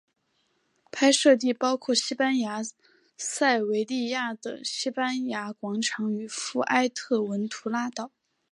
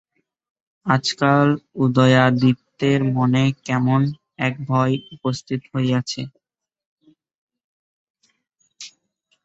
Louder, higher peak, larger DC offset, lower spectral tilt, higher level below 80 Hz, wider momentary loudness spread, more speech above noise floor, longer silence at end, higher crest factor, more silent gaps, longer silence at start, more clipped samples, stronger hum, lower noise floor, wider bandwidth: second, -26 LUFS vs -19 LUFS; second, -8 dBFS vs -2 dBFS; neither; second, -3 dB/octave vs -6.5 dB/octave; second, -82 dBFS vs -58 dBFS; second, 12 LU vs 15 LU; second, 46 dB vs 50 dB; about the same, 0.45 s vs 0.55 s; about the same, 20 dB vs 20 dB; second, none vs 6.86-6.97 s, 7.35-7.47 s, 7.64-8.14 s; about the same, 0.95 s vs 0.85 s; neither; neither; about the same, -72 dBFS vs -69 dBFS; first, 11.5 kHz vs 8 kHz